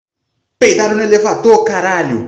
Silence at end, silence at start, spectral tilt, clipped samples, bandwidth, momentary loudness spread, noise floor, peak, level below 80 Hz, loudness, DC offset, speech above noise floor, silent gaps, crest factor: 0 s; 0.6 s; -4 dB/octave; under 0.1%; 8.4 kHz; 4 LU; -70 dBFS; 0 dBFS; -52 dBFS; -11 LUFS; under 0.1%; 59 dB; none; 12 dB